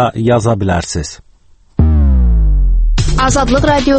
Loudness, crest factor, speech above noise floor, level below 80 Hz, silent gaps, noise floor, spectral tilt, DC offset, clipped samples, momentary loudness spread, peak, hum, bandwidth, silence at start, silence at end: -13 LUFS; 10 dB; 33 dB; -14 dBFS; none; -45 dBFS; -6 dB/octave; under 0.1%; under 0.1%; 8 LU; 0 dBFS; none; 8.8 kHz; 0 s; 0 s